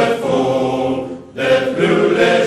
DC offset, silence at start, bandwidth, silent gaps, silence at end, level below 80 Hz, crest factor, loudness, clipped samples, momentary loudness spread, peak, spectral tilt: under 0.1%; 0 s; 12.5 kHz; none; 0 s; -52 dBFS; 14 dB; -16 LUFS; under 0.1%; 8 LU; -2 dBFS; -5.5 dB/octave